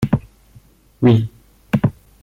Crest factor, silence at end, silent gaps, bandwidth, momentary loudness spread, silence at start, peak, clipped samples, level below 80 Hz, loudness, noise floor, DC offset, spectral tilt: 18 dB; 0.3 s; none; 14 kHz; 8 LU; 0 s; -2 dBFS; under 0.1%; -44 dBFS; -18 LUFS; -49 dBFS; under 0.1%; -9 dB/octave